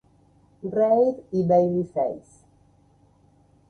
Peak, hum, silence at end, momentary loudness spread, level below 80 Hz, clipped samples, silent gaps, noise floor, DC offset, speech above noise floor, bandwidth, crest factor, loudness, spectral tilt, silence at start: -8 dBFS; none; 1.5 s; 11 LU; -62 dBFS; under 0.1%; none; -59 dBFS; under 0.1%; 37 dB; 9 kHz; 18 dB; -23 LUFS; -10 dB/octave; 0.65 s